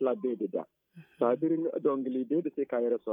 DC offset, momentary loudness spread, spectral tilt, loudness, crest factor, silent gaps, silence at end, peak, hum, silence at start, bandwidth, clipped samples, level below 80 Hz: under 0.1%; 6 LU; -10.5 dB/octave; -31 LUFS; 16 dB; none; 0 s; -14 dBFS; none; 0 s; 3.7 kHz; under 0.1%; -88 dBFS